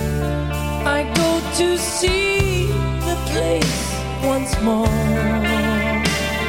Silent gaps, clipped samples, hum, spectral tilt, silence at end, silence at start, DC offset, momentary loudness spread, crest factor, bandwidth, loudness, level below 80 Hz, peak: none; under 0.1%; none; -4.5 dB/octave; 0 s; 0 s; 0.4%; 5 LU; 18 dB; 17 kHz; -19 LUFS; -28 dBFS; -2 dBFS